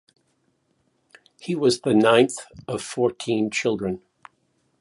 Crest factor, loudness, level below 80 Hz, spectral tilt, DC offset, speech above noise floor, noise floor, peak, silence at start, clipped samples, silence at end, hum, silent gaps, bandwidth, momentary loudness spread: 20 dB; -22 LUFS; -62 dBFS; -5 dB/octave; under 0.1%; 47 dB; -69 dBFS; -4 dBFS; 1.45 s; under 0.1%; 0.85 s; none; none; 11.5 kHz; 16 LU